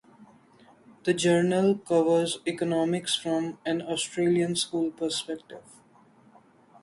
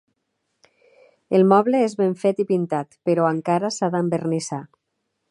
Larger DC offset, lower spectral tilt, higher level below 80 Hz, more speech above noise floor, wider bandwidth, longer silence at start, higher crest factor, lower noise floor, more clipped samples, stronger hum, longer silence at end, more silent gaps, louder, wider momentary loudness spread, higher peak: neither; second, -4.5 dB/octave vs -6.5 dB/octave; about the same, -70 dBFS vs -72 dBFS; second, 32 dB vs 56 dB; about the same, 11.5 kHz vs 11 kHz; second, 0.2 s vs 1.3 s; about the same, 16 dB vs 20 dB; second, -58 dBFS vs -76 dBFS; neither; neither; first, 1.2 s vs 0.65 s; neither; second, -26 LUFS vs -21 LUFS; about the same, 9 LU vs 10 LU; second, -12 dBFS vs -2 dBFS